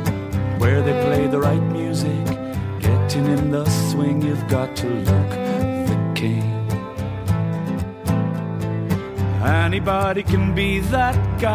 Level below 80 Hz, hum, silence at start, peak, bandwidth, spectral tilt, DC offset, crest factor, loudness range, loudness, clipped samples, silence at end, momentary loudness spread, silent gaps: -32 dBFS; none; 0 s; -4 dBFS; 16 kHz; -7 dB/octave; under 0.1%; 16 dB; 3 LU; -21 LUFS; under 0.1%; 0 s; 6 LU; none